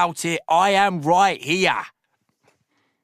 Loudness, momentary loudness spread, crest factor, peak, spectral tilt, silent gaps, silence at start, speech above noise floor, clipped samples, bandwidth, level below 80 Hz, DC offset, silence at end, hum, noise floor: -19 LUFS; 8 LU; 18 dB; -2 dBFS; -3.5 dB/octave; none; 0 s; 50 dB; under 0.1%; 15 kHz; -62 dBFS; under 0.1%; 1.15 s; none; -70 dBFS